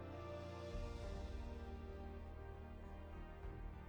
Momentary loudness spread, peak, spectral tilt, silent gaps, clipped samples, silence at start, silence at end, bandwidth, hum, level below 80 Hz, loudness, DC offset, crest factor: 5 LU; -36 dBFS; -7 dB/octave; none; under 0.1%; 0 s; 0 s; over 20 kHz; none; -52 dBFS; -52 LUFS; under 0.1%; 12 dB